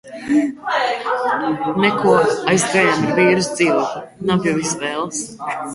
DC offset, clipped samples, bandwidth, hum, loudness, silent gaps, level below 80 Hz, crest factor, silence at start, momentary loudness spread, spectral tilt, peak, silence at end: under 0.1%; under 0.1%; 11.5 kHz; none; -18 LUFS; none; -56 dBFS; 16 dB; 0.05 s; 10 LU; -4.5 dB/octave; -2 dBFS; 0 s